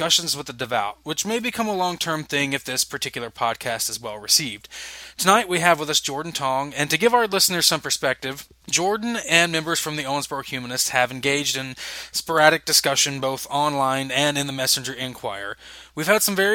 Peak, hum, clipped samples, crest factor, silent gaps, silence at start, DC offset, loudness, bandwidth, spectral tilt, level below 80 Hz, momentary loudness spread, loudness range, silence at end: 0 dBFS; none; under 0.1%; 22 dB; none; 0 s; under 0.1%; -21 LUFS; 17 kHz; -2 dB/octave; -58 dBFS; 12 LU; 4 LU; 0 s